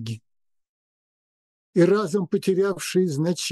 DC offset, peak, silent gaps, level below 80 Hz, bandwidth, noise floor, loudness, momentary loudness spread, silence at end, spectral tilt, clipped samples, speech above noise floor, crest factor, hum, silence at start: under 0.1%; -6 dBFS; 0.69-1.73 s; -72 dBFS; 12.5 kHz; -78 dBFS; -22 LUFS; 9 LU; 0 s; -5.5 dB/octave; under 0.1%; 57 dB; 18 dB; none; 0 s